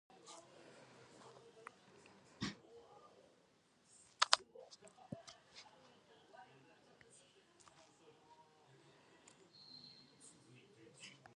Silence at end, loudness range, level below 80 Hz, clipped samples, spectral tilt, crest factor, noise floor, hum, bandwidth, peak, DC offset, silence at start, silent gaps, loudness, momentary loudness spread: 0 s; 22 LU; -82 dBFS; under 0.1%; -1.5 dB/octave; 44 dB; -73 dBFS; none; 11 kHz; -8 dBFS; under 0.1%; 0.1 s; none; -42 LUFS; 19 LU